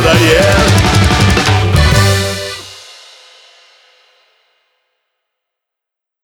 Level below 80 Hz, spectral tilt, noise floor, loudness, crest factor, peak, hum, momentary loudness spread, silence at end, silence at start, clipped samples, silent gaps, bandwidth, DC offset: -24 dBFS; -4.5 dB/octave; -81 dBFS; -10 LUFS; 12 dB; 0 dBFS; none; 16 LU; 3.45 s; 0 s; under 0.1%; none; 18.5 kHz; under 0.1%